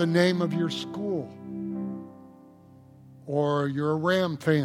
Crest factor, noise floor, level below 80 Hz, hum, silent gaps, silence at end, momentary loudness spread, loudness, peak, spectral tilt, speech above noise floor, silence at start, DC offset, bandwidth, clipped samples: 20 dB; -52 dBFS; -70 dBFS; none; none; 0 s; 14 LU; -27 LUFS; -8 dBFS; -6.5 dB/octave; 27 dB; 0 s; under 0.1%; 14 kHz; under 0.1%